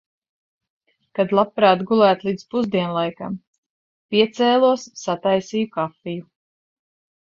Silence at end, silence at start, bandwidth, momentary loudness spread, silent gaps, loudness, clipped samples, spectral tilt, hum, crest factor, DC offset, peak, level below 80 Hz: 1.15 s; 1.15 s; 7.6 kHz; 15 LU; 3.47-4.09 s; -20 LUFS; under 0.1%; -5.5 dB/octave; none; 20 dB; under 0.1%; -2 dBFS; -64 dBFS